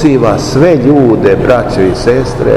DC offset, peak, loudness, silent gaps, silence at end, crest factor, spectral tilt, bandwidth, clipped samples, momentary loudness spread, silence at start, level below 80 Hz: 0.7%; 0 dBFS; -8 LUFS; none; 0 s; 8 dB; -7 dB/octave; 12.5 kHz; 4%; 4 LU; 0 s; -26 dBFS